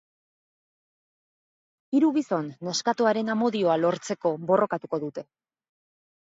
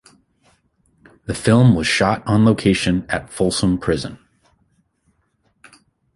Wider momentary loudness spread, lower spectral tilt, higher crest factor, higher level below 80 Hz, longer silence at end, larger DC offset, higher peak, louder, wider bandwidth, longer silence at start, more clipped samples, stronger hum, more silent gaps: second, 8 LU vs 12 LU; about the same, -5 dB/octave vs -6 dB/octave; about the same, 18 dB vs 18 dB; second, -78 dBFS vs -42 dBFS; second, 1.1 s vs 2 s; neither; second, -8 dBFS vs -2 dBFS; second, -25 LUFS vs -17 LUFS; second, 8 kHz vs 11.5 kHz; first, 1.9 s vs 1.3 s; neither; neither; neither